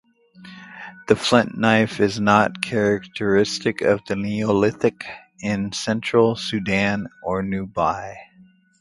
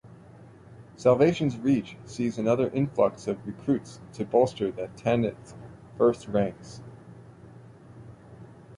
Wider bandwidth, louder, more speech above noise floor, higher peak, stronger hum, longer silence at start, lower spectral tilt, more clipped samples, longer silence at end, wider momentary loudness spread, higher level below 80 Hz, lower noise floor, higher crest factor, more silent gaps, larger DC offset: about the same, 11.5 kHz vs 11 kHz; first, -21 LUFS vs -26 LUFS; first, 32 dB vs 24 dB; first, 0 dBFS vs -8 dBFS; neither; first, 0.4 s vs 0.05 s; second, -5.5 dB/octave vs -7.5 dB/octave; neither; first, 0.55 s vs 0 s; second, 15 LU vs 22 LU; first, -52 dBFS vs -60 dBFS; about the same, -53 dBFS vs -50 dBFS; about the same, 22 dB vs 20 dB; neither; neither